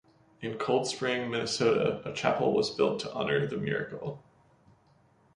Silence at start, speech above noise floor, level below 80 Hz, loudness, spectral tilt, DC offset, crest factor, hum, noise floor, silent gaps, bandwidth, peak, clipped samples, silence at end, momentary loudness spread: 0.4 s; 35 dB; -66 dBFS; -30 LUFS; -4.5 dB/octave; under 0.1%; 22 dB; none; -64 dBFS; none; 11 kHz; -8 dBFS; under 0.1%; 1.15 s; 13 LU